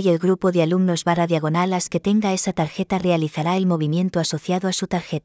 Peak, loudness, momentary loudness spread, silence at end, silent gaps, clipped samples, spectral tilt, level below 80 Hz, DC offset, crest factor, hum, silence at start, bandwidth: -4 dBFS; -21 LUFS; 4 LU; 0.05 s; none; under 0.1%; -5.5 dB/octave; -56 dBFS; under 0.1%; 16 dB; none; 0 s; 8 kHz